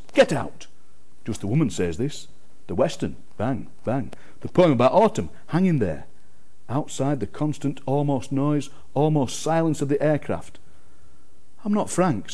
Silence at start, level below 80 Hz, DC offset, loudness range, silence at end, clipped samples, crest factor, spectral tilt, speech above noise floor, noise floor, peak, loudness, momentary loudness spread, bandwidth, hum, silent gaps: 0.15 s; -54 dBFS; 3%; 5 LU; 0 s; under 0.1%; 18 dB; -6.5 dB/octave; 36 dB; -59 dBFS; -6 dBFS; -24 LUFS; 12 LU; 11 kHz; none; none